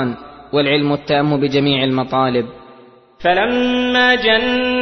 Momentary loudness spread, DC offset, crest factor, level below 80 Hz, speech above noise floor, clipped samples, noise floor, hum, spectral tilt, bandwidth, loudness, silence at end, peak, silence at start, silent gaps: 8 LU; under 0.1%; 14 dB; -46 dBFS; 29 dB; under 0.1%; -44 dBFS; none; -6.5 dB/octave; 6.4 kHz; -15 LUFS; 0 s; -2 dBFS; 0 s; none